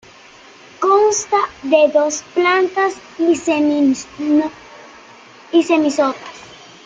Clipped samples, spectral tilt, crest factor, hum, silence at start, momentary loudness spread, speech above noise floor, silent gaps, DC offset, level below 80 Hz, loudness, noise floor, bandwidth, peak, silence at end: under 0.1%; -3 dB/octave; 16 dB; none; 0.8 s; 7 LU; 27 dB; none; under 0.1%; -60 dBFS; -16 LUFS; -43 dBFS; 9.4 kHz; -2 dBFS; 0.3 s